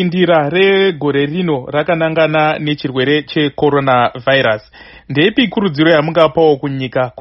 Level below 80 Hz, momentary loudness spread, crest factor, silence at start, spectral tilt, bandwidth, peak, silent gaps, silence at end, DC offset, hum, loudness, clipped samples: -48 dBFS; 7 LU; 14 dB; 0 s; -4 dB/octave; 6 kHz; 0 dBFS; none; 0 s; under 0.1%; none; -13 LUFS; under 0.1%